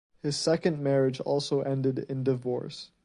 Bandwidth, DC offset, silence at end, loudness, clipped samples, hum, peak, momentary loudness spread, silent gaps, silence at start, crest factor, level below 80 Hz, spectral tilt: 11 kHz; under 0.1%; 0.2 s; -28 LUFS; under 0.1%; none; -12 dBFS; 7 LU; none; 0.25 s; 18 dB; -66 dBFS; -6 dB/octave